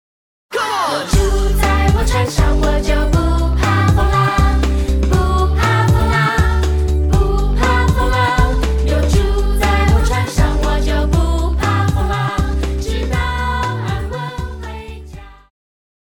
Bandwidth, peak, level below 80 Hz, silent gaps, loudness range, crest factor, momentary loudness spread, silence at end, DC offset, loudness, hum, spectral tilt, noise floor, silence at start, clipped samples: 17 kHz; -2 dBFS; -16 dBFS; none; 5 LU; 12 dB; 8 LU; 0.75 s; under 0.1%; -16 LUFS; none; -6 dB/octave; -34 dBFS; 0.5 s; under 0.1%